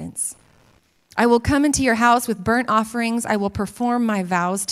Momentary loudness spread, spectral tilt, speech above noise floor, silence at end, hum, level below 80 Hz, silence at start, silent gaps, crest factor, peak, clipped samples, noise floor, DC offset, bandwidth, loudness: 9 LU; -4.5 dB/octave; 39 dB; 0 s; none; -44 dBFS; 0 s; none; 18 dB; -2 dBFS; under 0.1%; -58 dBFS; under 0.1%; 15.5 kHz; -20 LUFS